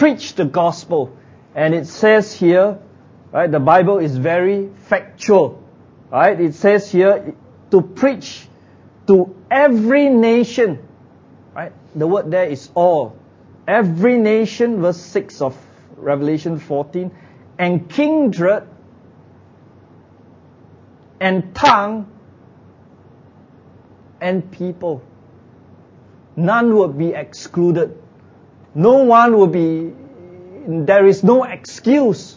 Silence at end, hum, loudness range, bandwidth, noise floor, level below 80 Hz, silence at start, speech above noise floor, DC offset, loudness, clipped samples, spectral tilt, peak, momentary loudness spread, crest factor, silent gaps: 0.1 s; none; 7 LU; 7.6 kHz; -46 dBFS; -58 dBFS; 0 s; 31 dB; under 0.1%; -15 LUFS; under 0.1%; -7 dB/octave; 0 dBFS; 15 LU; 16 dB; none